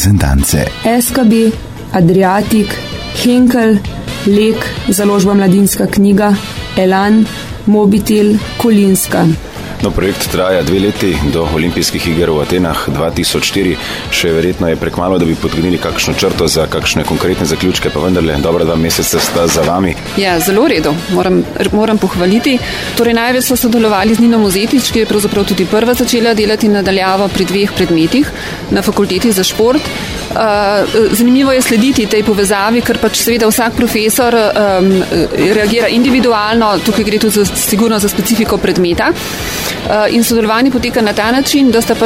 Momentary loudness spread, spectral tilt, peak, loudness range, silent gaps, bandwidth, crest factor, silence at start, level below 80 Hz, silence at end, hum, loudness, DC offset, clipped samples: 5 LU; -4.5 dB/octave; 0 dBFS; 2 LU; none; 16.5 kHz; 10 dB; 0 s; -28 dBFS; 0 s; none; -11 LUFS; 0.6%; under 0.1%